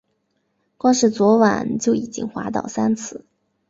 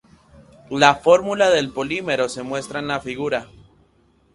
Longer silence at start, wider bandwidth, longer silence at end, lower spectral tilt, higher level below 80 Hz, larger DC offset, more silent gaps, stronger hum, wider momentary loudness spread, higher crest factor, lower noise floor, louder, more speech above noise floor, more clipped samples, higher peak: first, 0.85 s vs 0.7 s; second, 7.8 kHz vs 11.5 kHz; second, 0.5 s vs 0.9 s; about the same, -5 dB/octave vs -4 dB/octave; about the same, -58 dBFS vs -54 dBFS; neither; neither; neither; about the same, 12 LU vs 12 LU; about the same, 18 dB vs 22 dB; first, -70 dBFS vs -59 dBFS; about the same, -19 LUFS vs -20 LUFS; first, 51 dB vs 40 dB; neither; second, -4 dBFS vs 0 dBFS